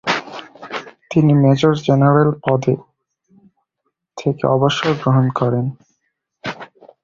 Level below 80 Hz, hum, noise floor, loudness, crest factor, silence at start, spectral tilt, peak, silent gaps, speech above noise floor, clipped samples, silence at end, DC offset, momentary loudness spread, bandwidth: -52 dBFS; none; -73 dBFS; -16 LUFS; 16 dB; 0.05 s; -7 dB/octave; -2 dBFS; none; 59 dB; under 0.1%; 0.4 s; under 0.1%; 17 LU; 7.4 kHz